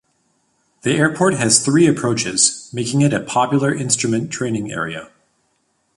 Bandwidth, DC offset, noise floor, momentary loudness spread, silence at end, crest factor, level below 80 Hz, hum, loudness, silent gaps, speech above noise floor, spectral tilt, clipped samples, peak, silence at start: 11.5 kHz; under 0.1%; -66 dBFS; 11 LU; 0.9 s; 18 dB; -54 dBFS; none; -17 LUFS; none; 48 dB; -4 dB/octave; under 0.1%; 0 dBFS; 0.85 s